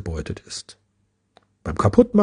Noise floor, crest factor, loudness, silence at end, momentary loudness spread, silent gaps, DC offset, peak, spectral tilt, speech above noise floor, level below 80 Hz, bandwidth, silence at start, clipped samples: -69 dBFS; 22 dB; -22 LUFS; 0 s; 19 LU; none; under 0.1%; 0 dBFS; -7 dB/octave; 49 dB; -42 dBFS; 10 kHz; 0 s; under 0.1%